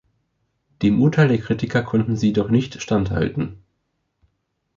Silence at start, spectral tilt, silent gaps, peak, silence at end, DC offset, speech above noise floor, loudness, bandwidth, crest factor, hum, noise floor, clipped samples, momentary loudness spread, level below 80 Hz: 0.8 s; -7.5 dB/octave; none; -4 dBFS; 1.2 s; under 0.1%; 54 dB; -20 LUFS; 7.4 kHz; 18 dB; none; -73 dBFS; under 0.1%; 7 LU; -44 dBFS